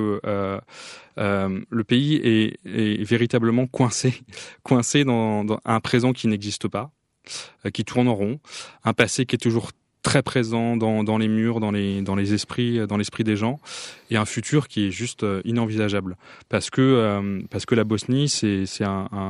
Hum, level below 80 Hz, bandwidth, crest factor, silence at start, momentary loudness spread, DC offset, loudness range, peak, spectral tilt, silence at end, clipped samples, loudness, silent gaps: none; -58 dBFS; 12 kHz; 22 dB; 0 s; 12 LU; under 0.1%; 3 LU; 0 dBFS; -5.5 dB/octave; 0 s; under 0.1%; -23 LUFS; none